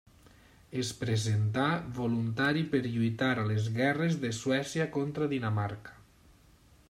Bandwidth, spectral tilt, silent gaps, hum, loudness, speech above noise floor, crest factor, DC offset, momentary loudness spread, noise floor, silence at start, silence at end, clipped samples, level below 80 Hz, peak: 13 kHz; -6 dB/octave; none; none; -31 LUFS; 30 dB; 18 dB; under 0.1%; 6 LU; -60 dBFS; 0.7 s; 0.95 s; under 0.1%; -62 dBFS; -14 dBFS